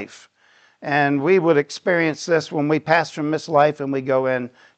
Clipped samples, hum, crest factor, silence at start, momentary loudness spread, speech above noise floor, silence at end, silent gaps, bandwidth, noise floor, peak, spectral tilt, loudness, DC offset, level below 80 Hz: under 0.1%; none; 18 dB; 0 s; 8 LU; 37 dB; 0.3 s; none; 8.8 kHz; -56 dBFS; -2 dBFS; -6 dB/octave; -19 LUFS; under 0.1%; -70 dBFS